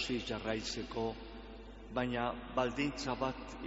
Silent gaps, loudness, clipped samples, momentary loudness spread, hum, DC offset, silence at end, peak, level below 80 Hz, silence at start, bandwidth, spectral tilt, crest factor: none; -38 LUFS; under 0.1%; 14 LU; 50 Hz at -55 dBFS; under 0.1%; 0 s; -18 dBFS; -54 dBFS; 0 s; 8 kHz; -3.5 dB/octave; 20 dB